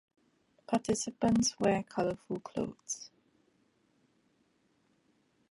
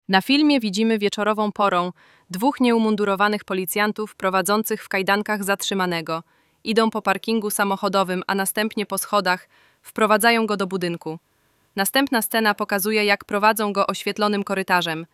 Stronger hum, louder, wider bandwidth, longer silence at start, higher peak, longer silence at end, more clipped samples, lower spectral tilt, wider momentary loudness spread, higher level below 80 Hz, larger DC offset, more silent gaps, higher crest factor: neither; second, -33 LUFS vs -21 LUFS; second, 11.5 kHz vs 16.5 kHz; first, 0.7 s vs 0.1 s; second, -16 dBFS vs -2 dBFS; first, 2.45 s vs 0.1 s; neither; about the same, -4.5 dB/octave vs -4 dB/octave; first, 12 LU vs 7 LU; about the same, -64 dBFS vs -68 dBFS; neither; neither; about the same, 20 dB vs 18 dB